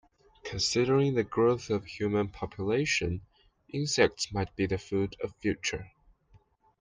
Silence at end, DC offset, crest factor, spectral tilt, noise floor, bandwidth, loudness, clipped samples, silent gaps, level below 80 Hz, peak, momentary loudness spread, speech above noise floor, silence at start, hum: 0.9 s; under 0.1%; 22 dB; -4.5 dB/octave; -63 dBFS; 10 kHz; -30 LUFS; under 0.1%; none; -54 dBFS; -10 dBFS; 10 LU; 34 dB; 0.45 s; none